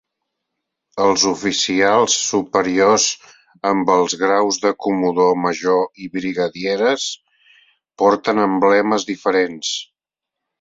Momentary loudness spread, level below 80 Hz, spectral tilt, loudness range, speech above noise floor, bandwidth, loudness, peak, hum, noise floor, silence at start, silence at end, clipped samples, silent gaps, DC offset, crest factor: 9 LU; -60 dBFS; -3 dB/octave; 3 LU; 67 dB; 7.8 kHz; -17 LUFS; -2 dBFS; none; -84 dBFS; 0.95 s; 0.75 s; under 0.1%; none; under 0.1%; 16 dB